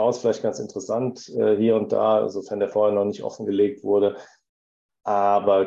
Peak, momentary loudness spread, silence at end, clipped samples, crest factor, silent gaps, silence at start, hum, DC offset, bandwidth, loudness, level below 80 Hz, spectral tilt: -6 dBFS; 8 LU; 0 s; under 0.1%; 16 dB; 4.49-4.89 s; 0 s; none; under 0.1%; 7.8 kHz; -23 LUFS; -66 dBFS; -6.5 dB/octave